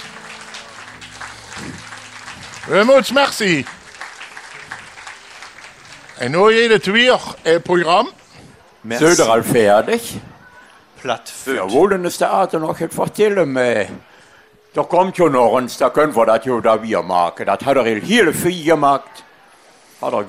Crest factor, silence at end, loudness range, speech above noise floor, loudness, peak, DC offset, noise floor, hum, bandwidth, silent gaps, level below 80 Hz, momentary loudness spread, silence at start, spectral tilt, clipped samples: 16 dB; 0 s; 4 LU; 34 dB; -15 LUFS; -2 dBFS; under 0.1%; -49 dBFS; none; 16 kHz; none; -54 dBFS; 21 LU; 0 s; -4 dB/octave; under 0.1%